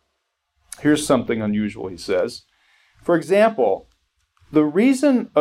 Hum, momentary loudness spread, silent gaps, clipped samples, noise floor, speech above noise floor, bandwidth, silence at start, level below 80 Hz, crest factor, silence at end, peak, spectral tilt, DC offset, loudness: none; 12 LU; none; under 0.1%; -74 dBFS; 56 dB; 14.5 kHz; 0.8 s; -56 dBFS; 16 dB; 0 s; -4 dBFS; -5.5 dB/octave; under 0.1%; -20 LUFS